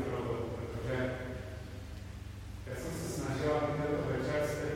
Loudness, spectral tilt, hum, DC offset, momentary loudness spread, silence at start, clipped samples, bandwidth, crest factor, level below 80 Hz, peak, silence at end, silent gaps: -37 LUFS; -6 dB/octave; none; under 0.1%; 13 LU; 0 s; under 0.1%; 16 kHz; 16 dB; -50 dBFS; -20 dBFS; 0 s; none